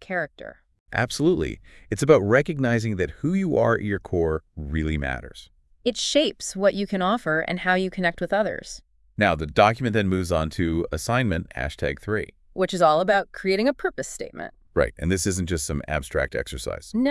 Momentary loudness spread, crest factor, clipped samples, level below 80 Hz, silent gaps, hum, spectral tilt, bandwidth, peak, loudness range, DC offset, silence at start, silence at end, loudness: 13 LU; 22 dB; under 0.1%; -42 dBFS; 0.80-0.86 s; none; -5 dB/octave; 12 kHz; -2 dBFS; 3 LU; under 0.1%; 0 s; 0 s; -24 LUFS